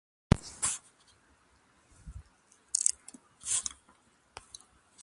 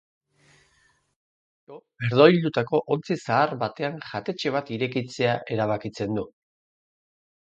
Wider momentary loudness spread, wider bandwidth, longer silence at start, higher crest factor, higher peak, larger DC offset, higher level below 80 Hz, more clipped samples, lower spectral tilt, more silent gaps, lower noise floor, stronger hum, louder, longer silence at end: first, 24 LU vs 14 LU; first, 11.5 kHz vs 8.2 kHz; second, 0.35 s vs 1.7 s; first, 34 dB vs 24 dB; about the same, -2 dBFS vs -2 dBFS; neither; first, -48 dBFS vs -64 dBFS; neither; second, -3.5 dB/octave vs -6.5 dB/octave; neither; about the same, -66 dBFS vs -65 dBFS; neither; second, -31 LUFS vs -24 LUFS; about the same, 1.3 s vs 1.3 s